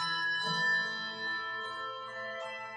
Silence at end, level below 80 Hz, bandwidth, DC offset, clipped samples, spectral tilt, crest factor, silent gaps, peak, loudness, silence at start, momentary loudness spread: 0 s; -80 dBFS; 10.5 kHz; under 0.1%; under 0.1%; -2.5 dB/octave; 14 dB; none; -22 dBFS; -33 LUFS; 0 s; 11 LU